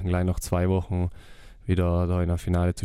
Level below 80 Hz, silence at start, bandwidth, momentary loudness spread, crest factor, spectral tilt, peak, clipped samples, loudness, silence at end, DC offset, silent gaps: -40 dBFS; 0 s; 14.5 kHz; 5 LU; 16 dB; -7.5 dB/octave; -8 dBFS; under 0.1%; -26 LUFS; 0 s; under 0.1%; none